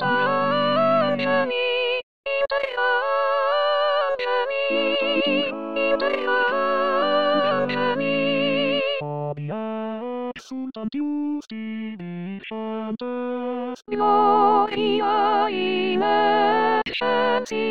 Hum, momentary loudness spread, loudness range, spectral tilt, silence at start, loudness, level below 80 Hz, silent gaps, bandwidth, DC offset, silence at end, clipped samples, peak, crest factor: none; 11 LU; 9 LU; -5.5 dB/octave; 0 s; -22 LUFS; -64 dBFS; 2.03-2.24 s; 7.4 kHz; 0.6%; 0 s; under 0.1%; -6 dBFS; 16 dB